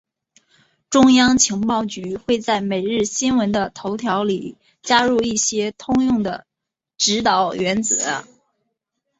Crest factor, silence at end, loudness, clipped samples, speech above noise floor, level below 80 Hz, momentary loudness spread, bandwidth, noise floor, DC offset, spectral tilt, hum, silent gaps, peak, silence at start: 18 dB; 0.95 s; -18 LUFS; under 0.1%; 66 dB; -52 dBFS; 12 LU; 8 kHz; -84 dBFS; under 0.1%; -3 dB/octave; none; none; -2 dBFS; 0.9 s